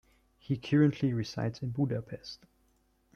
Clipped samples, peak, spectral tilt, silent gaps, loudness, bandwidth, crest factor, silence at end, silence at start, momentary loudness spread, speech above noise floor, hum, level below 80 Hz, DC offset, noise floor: under 0.1%; -14 dBFS; -7.5 dB/octave; none; -31 LUFS; 7 kHz; 18 dB; 0.8 s; 0.5 s; 18 LU; 40 dB; none; -64 dBFS; under 0.1%; -70 dBFS